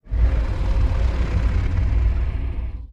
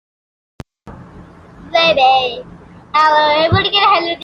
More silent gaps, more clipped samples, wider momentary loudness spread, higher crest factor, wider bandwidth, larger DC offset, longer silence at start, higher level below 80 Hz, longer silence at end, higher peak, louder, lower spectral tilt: neither; neither; about the same, 6 LU vs 8 LU; about the same, 12 dB vs 14 dB; second, 6 kHz vs 10.5 kHz; neither; second, 0.05 s vs 0.85 s; first, -20 dBFS vs -44 dBFS; about the same, 0 s vs 0 s; second, -8 dBFS vs -2 dBFS; second, -23 LUFS vs -12 LUFS; first, -8 dB/octave vs -5 dB/octave